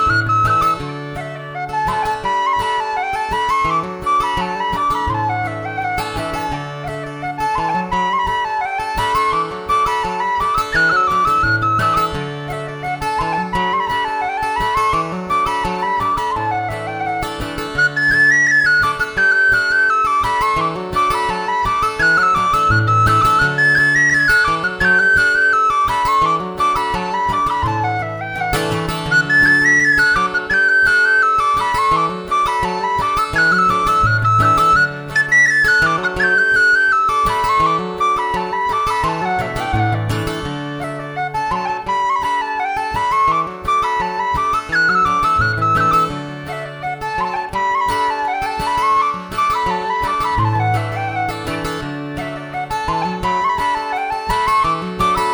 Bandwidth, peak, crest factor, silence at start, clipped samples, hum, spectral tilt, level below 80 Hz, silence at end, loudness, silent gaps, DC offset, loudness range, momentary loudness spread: over 20 kHz; -2 dBFS; 14 dB; 0 s; under 0.1%; none; -4.5 dB/octave; -36 dBFS; 0 s; -16 LUFS; none; under 0.1%; 7 LU; 11 LU